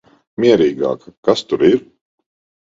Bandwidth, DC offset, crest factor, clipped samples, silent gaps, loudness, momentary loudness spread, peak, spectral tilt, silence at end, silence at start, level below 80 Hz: 7.8 kHz; under 0.1%; 16 dB; under 0.1%; 1.17-1.23 s; -16 LUFS; 9 LU; 0 dBFS; -6 dB/octave; 0.9 s; 0.4 s; -54 dBFS